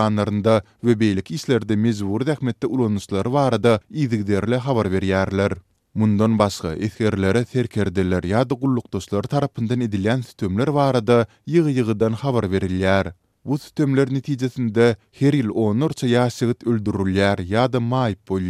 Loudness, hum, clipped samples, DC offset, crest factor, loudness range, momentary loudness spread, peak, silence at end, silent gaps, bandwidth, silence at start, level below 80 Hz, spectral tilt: -21 LUFS; none; under 0.1%; under 0.1%; 18 dB; 1 LU; 5 LU; 0 dBFS; 0 s; none; 14 kHz; 0 s; -50 dBFS; -7 dB/octave